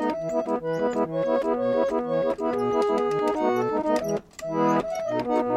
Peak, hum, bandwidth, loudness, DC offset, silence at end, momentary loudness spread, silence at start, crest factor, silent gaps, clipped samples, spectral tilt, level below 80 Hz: -10 dBFS; none; 14 kHz; -25 LUFS; under 0.1%; 0 s; 4 LU; 0 s; 14 dB; none; under 0.1%; -6.5 dB/octave; -56 dBFS